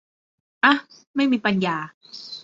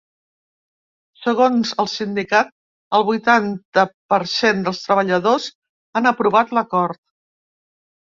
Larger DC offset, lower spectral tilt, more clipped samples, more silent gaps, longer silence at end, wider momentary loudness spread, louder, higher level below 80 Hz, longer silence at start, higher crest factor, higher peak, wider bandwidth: neither; about the same, -5.5 dB/octave vs -5 dB/octave; neither; second, 1.07-1.14 s, 1.94-2.01 s vs 2.52-2.91 s, 3.65-3.72 s, 3.94-4.09 s, 5.55-5.62 s, 5.69-5.93 s; second, 0.05 s vs 1.15 s; first, 17 LU vs 8 LU; second, -21 LUFS vs -18 LUFS; about the same, -68 dBFS vs -64 dBFS; second, 0.65 s vs 1.2 s; about the same, 20 dB vs 18 dB; about the same, -2 dBFS vs -2 dBFS; about the same, 7.8 kHz vs 7.6 kHz